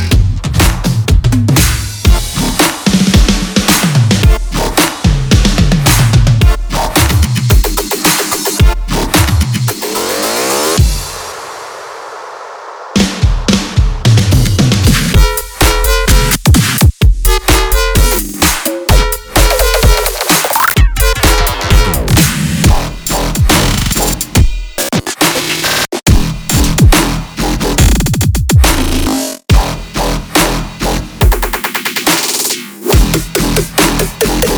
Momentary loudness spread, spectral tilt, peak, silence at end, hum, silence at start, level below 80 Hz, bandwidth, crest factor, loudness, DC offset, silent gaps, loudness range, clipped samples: 6 LU; -4 dB/octave; 0 dBFS; 0 s; none; 0 s; -14 dBFS; over 20 kHz; 10 dB; -11 LUFS; under 0.1%; none; 3 LU; 0.2%